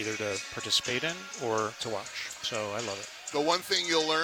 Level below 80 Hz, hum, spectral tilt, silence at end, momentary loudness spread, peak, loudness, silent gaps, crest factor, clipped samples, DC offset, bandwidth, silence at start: -70 dBFS; none; -2 dB/octave; 0 s; 9 LU; -12 dBFS; -30 LUFS; none; 18 dB; under 0.1%; under 0.1%; 19 kHz; 0 s